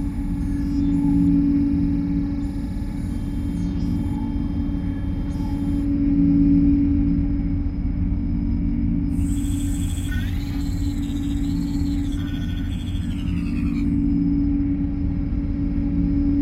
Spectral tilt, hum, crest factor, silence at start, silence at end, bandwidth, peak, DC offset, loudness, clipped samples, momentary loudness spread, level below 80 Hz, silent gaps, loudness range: -8 dB/octave; none; 14 dB; 0 s; 0 s; 13 kHz; -6 dBFS; under 0.1%; -23 LUFS; under 0.1%; 8 LU; -28 dBFS; none; 5 LU